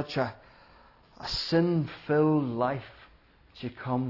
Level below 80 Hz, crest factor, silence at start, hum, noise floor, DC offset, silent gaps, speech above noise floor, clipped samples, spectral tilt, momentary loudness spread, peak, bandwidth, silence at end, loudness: -56 dBFS; 18 dB; 0 s; none; -59 dBFS; under 0.1%; none; 31 dB; under 0.1%; -7 dB/octave; 16 LU; -12 dBFS; 6 kHz; 0 s; -28 LUFS